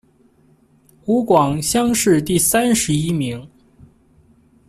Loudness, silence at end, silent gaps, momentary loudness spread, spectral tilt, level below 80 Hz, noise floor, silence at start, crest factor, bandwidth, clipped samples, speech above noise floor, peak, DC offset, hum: -17 LUFS; 1.2 s; none; 10 LU; -4.5 dB/octave; -46 dBFS; -55 dBFS; 1.05 s; 16 dB; 15 kHz; under 0.1%; 38 dB; -4 dBFS; under 0.1%; none